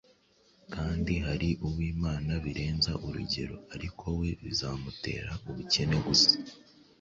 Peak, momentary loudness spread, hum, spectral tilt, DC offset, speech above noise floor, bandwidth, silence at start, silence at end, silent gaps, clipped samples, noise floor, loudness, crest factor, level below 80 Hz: -8 dBFS; 15 LU; none; -4.5 dB/octave; under 0.1%; 34 dB; 7.8 kHz; 0.7 s; 0.4 s; none; under 0.1%; -65 dBFS; -30 LUFS; 22 dB; -44 dBFS